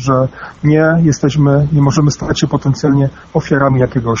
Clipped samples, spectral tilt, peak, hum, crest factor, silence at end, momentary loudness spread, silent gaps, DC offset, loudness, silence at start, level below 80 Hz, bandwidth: under 0.1%; -7 dB/octave; 0 dBFS; none; 12 dB; 0 s; 5 LU; none; under 0.1%; -13 LUFS; 0 s; -36 dBFS; 7.4 kHz